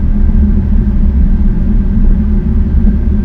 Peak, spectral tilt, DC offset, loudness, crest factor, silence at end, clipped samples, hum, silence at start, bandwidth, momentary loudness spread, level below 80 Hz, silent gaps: 0 dBFS; -11.5 dB/octave; under 0.1%; -13 LUFS; 8 dB; 0 s; 0.5%; none; 0 s; 2.4 kHz; 2 LU; -10 dBFS; none